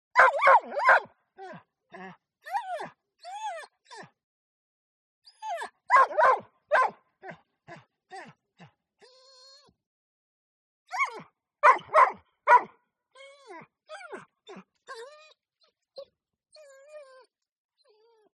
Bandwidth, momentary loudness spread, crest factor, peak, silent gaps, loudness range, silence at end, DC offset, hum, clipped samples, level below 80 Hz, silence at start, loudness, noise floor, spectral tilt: 11.5 kHz; 27 LU; 26 dB; -4 dBFS; 4.24-5.22 s, 9.86-10.86 s; 22 LU; 1.4 s; under 0.1%; none; under 0.1%; -86 dBFS; 0.15 s; -24 LUFS; -72 dBFS; -2.5 dB/octave